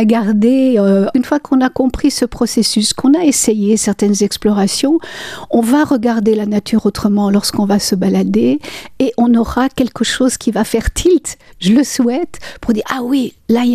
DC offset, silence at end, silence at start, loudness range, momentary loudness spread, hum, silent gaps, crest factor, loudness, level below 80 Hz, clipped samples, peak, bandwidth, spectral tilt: under 0.1%; 0 s; 0 s; 2 LU; 6 LU; none; none; 12 dB; -13 LUFS; -34 dBFS; under 0.1%; 0 dBFS; 15 kHz; -4.5 dB/octave